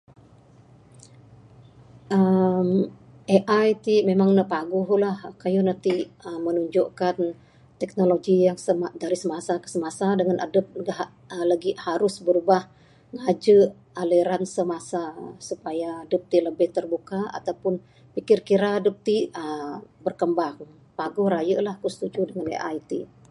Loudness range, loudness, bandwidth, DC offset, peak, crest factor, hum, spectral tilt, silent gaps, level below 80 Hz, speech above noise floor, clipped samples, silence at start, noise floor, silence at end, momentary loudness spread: 5 LU; -24 LUFS; 11.5 kHz; under 0.1%; -4 dBFS; 20 dB; none; -6.5 dB/octave; none; -66 dBFS; 29 dB; under 0.1%; 2.1 s; -52 dBFS; 0.25 s; 12 LU